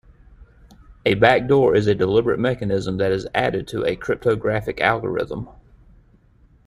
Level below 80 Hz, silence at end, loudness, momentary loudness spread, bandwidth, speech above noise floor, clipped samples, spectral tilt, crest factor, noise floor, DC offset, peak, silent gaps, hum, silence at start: -46 dBFS; 1.15 s; -20 LUFS; 9 LU; 12 kHz; 35 dB; under 0.1%; -7 dB/octave; 20 dB; -54 dBFS; under 0.1%; -2 dBFS; none; none; 0.9 s